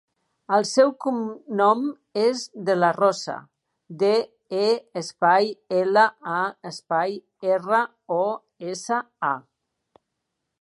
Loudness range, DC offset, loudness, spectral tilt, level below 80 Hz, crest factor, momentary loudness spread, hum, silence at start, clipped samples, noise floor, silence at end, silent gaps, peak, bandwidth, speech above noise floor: 4 LU; under 0.1%; -23 LUFS; -4.5 dB/octave; -80 dBFS; 18 dB; 11 LU; none; 0.5 s; under 0.1%; -80 dBFS; 1.2 s; none; -4 dBFS; 11.5 kHz; 58 dB